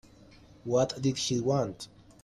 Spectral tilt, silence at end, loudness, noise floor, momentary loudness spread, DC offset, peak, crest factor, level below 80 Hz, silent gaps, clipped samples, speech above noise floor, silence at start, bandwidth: -5.5 dB/octave; 0.35 s; -29 LUFS; -55 dBFS; 17 LU; under 0.1%; -14 dBFS; 18 dB; -60 dBFS; none; under 0.1%; 26 dB; 0.65 s; 12.5 kHz